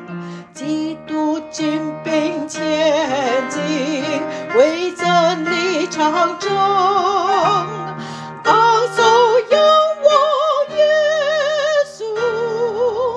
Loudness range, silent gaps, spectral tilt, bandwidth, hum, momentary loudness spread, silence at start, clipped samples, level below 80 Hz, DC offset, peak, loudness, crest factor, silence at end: 5 LU; none; -4 dB/octave; 10.5 kHz; none; 10 LU; 0 s; under 0.1%; -60 dBFS; under 0.1%; 0 dBFS; -16 LUFS; 16 dB; 0 s